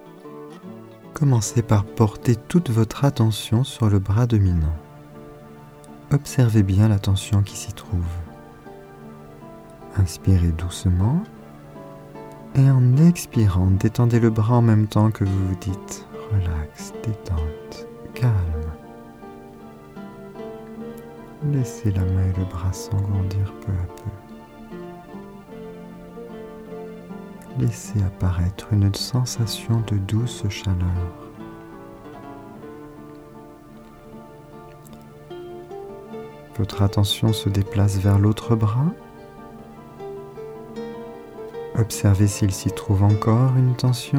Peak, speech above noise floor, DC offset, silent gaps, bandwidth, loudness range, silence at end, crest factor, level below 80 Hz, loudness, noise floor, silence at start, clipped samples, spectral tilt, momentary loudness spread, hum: -4 dBFS; 24 dB; under 0.1%; none; 15.5 kHz; 14 LU; 0 s; 18 dB; -40 dBFS; -21 LUFS; -43 dBFS; 0.05 s; under 0.1%; -6.5 dB/octave; 23 LU; none